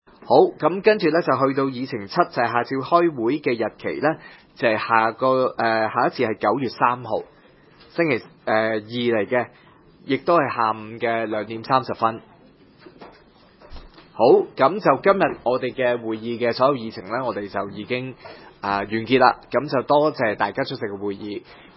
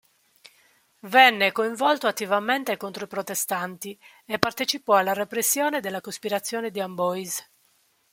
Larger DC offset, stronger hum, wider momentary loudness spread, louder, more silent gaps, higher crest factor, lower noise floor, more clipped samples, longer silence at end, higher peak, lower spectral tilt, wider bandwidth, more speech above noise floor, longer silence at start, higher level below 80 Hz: neither; neither; second, 11 LU vs 14 LU; first, -21 LUFS vs -24 LUFS; neither; about the same, 22 dB vs 26 dB; second, -52 dBFS vs -65 dBFS; neither; second, 0.25 s vs 0.7 s; about the same, 0 dBFS vs 0 dBFS; first, -10 dB/octave vs -2 dB/octave; second, 5.8 kHz vs 17 kHz; second, 31 dB vs 41 dB; second, 0.25 s vs 1.05 s; first, -58 dBFS vs -72 dBFS